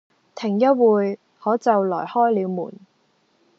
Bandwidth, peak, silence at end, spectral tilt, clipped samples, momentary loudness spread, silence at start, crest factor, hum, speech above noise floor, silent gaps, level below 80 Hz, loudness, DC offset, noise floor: 7.6 kHz; -4 dBFS; 0.9 s; -6.5 dB/octave; under 0.1%; 12 LU; 0.35 s; 16 dB; none; 44 dB; none; -80 dBFS; -20 LUFS; under 0.1%; -64 dBFS